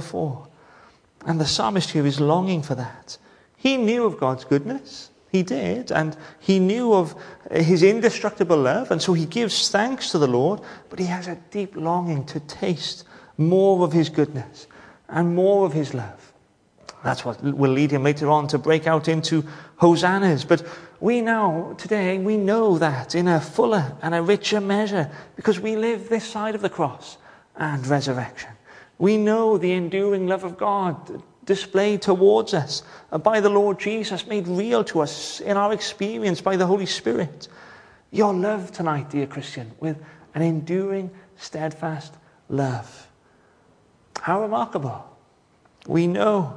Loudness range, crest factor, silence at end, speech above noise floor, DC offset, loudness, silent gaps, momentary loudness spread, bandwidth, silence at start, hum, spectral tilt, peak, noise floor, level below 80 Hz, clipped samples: 7 LU; 20 dB; 0 s; 37 dB; under 0.1%; -22 LUFS; none; 13 LU; 10.5 kHz; 0 s; none; -6 dB/octave; -2 dBFS; -59 dBFS; -62 dBFS; under 0.1%